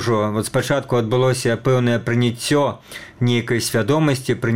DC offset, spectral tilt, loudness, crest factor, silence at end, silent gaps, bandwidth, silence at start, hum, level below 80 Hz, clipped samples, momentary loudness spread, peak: 0.4%; -5.5 dB/octave; -19 LUFS; 14 dB; 0 s; none; 16.5 kHz; 0 s; none; -50 dBFS; under 0.1%; 4 LU; -4 dBFS